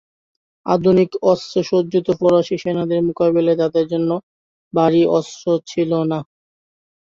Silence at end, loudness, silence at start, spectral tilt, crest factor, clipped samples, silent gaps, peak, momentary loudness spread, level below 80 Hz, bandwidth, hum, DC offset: 0.9 s; -18 LUFS; 0.65 s; -7 dB/octave; 16 dB; under 0.1%; 4.23-4.71 s; -2 dBFS; 7 LU; -58 dBFS; 7.6 kHz; none; under 0.1%